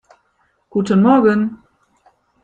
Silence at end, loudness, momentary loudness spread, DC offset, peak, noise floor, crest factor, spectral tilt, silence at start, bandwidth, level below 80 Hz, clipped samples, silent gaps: 0.9 s; -15 LUFS; 12 LU; under 0.1%; -2 dBFS; -63 dBFS; 16 dB; -8 dB/octave; 0.75 s; 8.4 kHz; -58 dBFS; under 0.1%; none